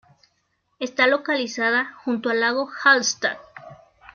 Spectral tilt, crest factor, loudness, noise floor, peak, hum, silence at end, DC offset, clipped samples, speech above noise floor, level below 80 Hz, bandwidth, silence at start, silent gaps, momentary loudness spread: -1.5 dB/octave; 20 dB; -21 LUFS; -70 dBFS; -4 dBFS; none; 0.4 s; under 0.1%; under 0.1%; 49 dB; -70 dBFS; 7.4 kHz; 0.8 s; none; 10 LU